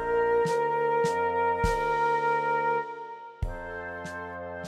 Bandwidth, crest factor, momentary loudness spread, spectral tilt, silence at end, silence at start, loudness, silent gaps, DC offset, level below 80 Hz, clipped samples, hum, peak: 13 kHz; 14 dB; 12 LU; -5.5 dB/octave; 0 s; 0 s; -28 LUFS; none; under 0.1%; -44 dBFS; under 0.1%; none; -14 dBFS